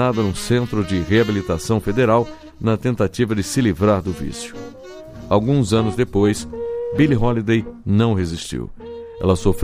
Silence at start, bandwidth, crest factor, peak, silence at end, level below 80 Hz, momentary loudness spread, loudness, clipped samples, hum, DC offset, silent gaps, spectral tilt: 0 s; 15.5 kHz; 16 dB; -2 dBFS; 0 s; -36 dBFS; 14 LU; -19 LUFS; under 0.1%; none; under 0.1%; none; -6.5 dB/octave